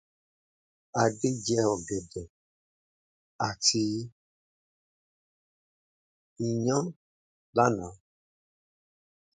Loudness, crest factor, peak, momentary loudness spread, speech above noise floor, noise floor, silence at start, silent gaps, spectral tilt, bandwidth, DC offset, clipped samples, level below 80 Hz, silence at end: -29 LUFS; 24 dB; -8 dBFS; 14 LU; over 62 dB; under -90 dBFS; 0.95 s; 2.30-3.39 s, 4.12-6.36 s, 6.96-7.53 s; -4 dB/octave; 9.6 kHz; under 0.1%; under 0.1%; -62 dBFS; 1.4 s